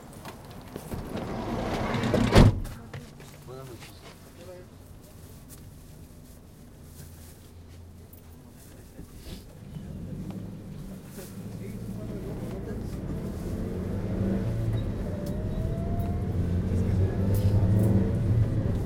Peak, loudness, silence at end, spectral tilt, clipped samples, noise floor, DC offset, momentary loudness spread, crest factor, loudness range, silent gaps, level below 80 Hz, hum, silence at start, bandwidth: -4 dBFS; -28 LUFS; 0 s; -7.5 dB/octave; under 0.1%; -48 dBFS; under 0.1%; 24 LU; 26 dB; 21 LU; none; -38 dBFS; none; 0 s; 16.5 kHz